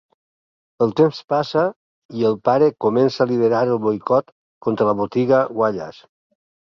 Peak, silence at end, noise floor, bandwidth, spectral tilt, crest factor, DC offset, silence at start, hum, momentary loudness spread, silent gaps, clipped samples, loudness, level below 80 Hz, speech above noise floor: -2 dBFS; 0.75 s; under -90 dBFS; 6.8 kHz; -7.5 dB/octave; 16 dB; under 0.1%; 0.8 s; none; 7 LU; 1.24-1.28 s, 1.76-2.09 s, 4.32-4.61 s; under 0.1%; -19 LUFS; -60 dBFS; over 72 dB